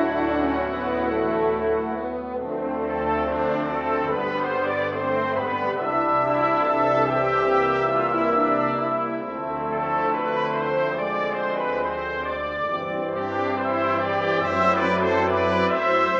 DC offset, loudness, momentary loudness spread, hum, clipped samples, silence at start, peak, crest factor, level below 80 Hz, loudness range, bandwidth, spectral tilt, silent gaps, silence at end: under 0.1%; -23 LUFS; 7 LU; none; under 0.1%; 0 s; -8 dBFS; 14 dB; -50 dBFS; 4 LU; 7.4 kHz; -7 dB/octave; none; 0 s